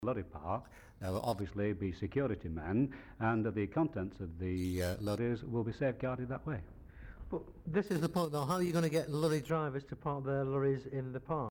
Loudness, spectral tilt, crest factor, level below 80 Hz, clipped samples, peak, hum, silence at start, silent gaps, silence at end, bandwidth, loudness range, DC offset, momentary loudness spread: -37 LUFS; -7 dB/octave; 16 dB; -56 dBFS; under 0.1%; -20 dBFS; none; 0 s; none; 0 s; 19.5 kHz; 3 LU; under 0.1%; 9 LU